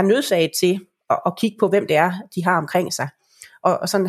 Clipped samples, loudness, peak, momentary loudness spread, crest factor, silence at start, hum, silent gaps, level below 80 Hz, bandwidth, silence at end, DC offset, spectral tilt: under 0.1%; -20 LUFS; -2 dBFS; 7 LU; 18 dB; 0 s; none; none; -70 dBFS; 15.5 kHz; 0 s; under 0.1%; -4.5 dB/octave